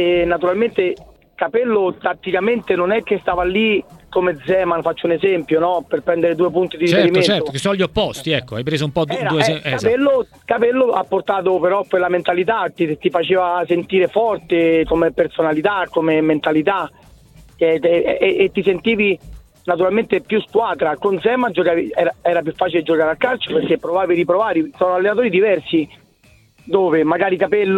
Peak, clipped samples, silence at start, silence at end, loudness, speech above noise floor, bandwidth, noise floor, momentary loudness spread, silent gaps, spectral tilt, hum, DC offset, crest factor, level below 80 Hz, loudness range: 0 dBFS; under 0.1%; 0 s; 0 s; -17 LUFS; 35 dB; 12 kHz; -52 dBFS; 5 LU; none; -6 dB/octave; none; under 0.1%; 16 dB; -48 dBFS; 1 LU